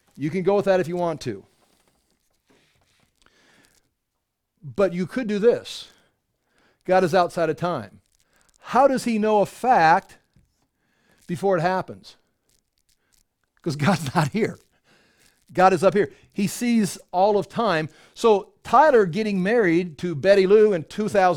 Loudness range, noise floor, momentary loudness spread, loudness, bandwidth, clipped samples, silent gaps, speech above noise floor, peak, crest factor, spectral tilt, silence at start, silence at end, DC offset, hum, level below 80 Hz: 10 LU; -79 dBFS; 13 LU; -21 LUFS; 17 kHz; under 0.1%; none; 58 dB; -2 dBFS; 20 dB; -6 dB/octave; 0.2 s; 0 s; under 0.1%; none; -60 dBFS